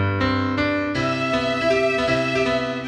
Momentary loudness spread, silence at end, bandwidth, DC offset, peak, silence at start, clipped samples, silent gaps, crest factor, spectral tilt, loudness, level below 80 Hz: 3 LU; 0 s; 11 kHz; under 0.1%; -6 dBFS; 0 s; under 0.1%; none; 14 dB; -6 dB/octave; -21 LUFS; -44 dBFS